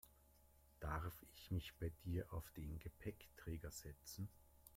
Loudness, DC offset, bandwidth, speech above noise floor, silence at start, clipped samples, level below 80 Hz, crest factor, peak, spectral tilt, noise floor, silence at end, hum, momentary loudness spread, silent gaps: -51 LUFS; under 0.1%; 16.5 kHz; 21 dB; 0.05 s; under 0.1%; -60 dBFS; 20 dB; -32 dBFS; -5.5 dB/octave; -71 dBFS; 0 s; none; 8 LU; none